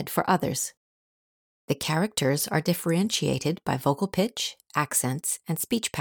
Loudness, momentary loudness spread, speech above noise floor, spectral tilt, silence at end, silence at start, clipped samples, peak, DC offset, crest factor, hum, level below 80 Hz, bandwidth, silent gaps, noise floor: -26 LUFS; 5 LU; over 63 dB; -4 dB/octave; 0 s; 0 s; under 0.1%; -10 dBFS; under 0.1%; 18 dB; none; -62 dBFS; over 20 kHz; 0.77-1.68 s; under -90 dBFS